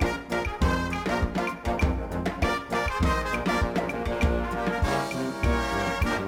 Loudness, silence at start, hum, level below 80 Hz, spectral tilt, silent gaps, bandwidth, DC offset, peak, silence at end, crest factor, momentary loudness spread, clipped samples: -27 LUFS; 0 s; none; -32 dBFS; -6 dB/octave; none; 16.5 kHz; under 0.1%; -12 dBFS; 0 s; 14 dB; 4 LU; under 0.1%